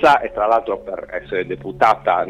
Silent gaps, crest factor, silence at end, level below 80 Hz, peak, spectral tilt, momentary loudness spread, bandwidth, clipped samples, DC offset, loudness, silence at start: none; 14 dB; 0 s; -48 dBFS; -2 dBFS; -5.5 dB/octave; 12 LU; 13 kHz; under 0.1%; under 0.1%; -19 LUFS; 0 s